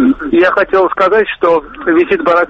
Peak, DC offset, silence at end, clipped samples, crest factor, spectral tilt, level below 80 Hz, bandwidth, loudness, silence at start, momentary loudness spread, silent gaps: 0 dBFS; under 0.1%; 0 s; under 0.1%; 10 dB; -6.5 dB/octave; -42 dBFS; 6.8 kHz; -11 LUFS; 0 s; 3 LU; none